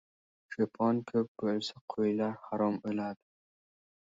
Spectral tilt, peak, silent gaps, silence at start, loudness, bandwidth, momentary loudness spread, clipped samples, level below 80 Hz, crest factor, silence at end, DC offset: -7 dB/octave; -16 dBFS; 1.28-1.35 s, 1.81-1.88 s; 0.5 s; -33 LUFS; 7.8 kHz; 8 LU; under 0.1%; -74 dBFS; 18 dB; 1 s; under 0.1%